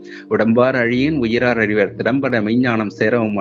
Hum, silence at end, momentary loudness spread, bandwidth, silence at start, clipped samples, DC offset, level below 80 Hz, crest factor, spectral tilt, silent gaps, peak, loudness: none; 0 s; 4 LU; 7 kHz; 0 s; under 0.1%; under 0.1%; -48 dBFS; 16 dB; -7.5 dB/octave; none; 0 dBFS; -17 LUFS